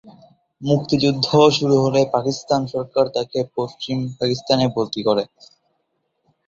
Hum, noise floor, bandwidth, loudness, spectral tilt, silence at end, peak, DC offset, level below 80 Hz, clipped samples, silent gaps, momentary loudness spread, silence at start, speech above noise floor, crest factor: none; -71 dBFS; 7.8 kHz; -19 LUFS; -6 dB/octave; 1.25 s; -2 dBFS; under 0.1%; -56 dBFS; under 0.1%; none; 11 LU; 0.05 s; 52 dB; 18 dB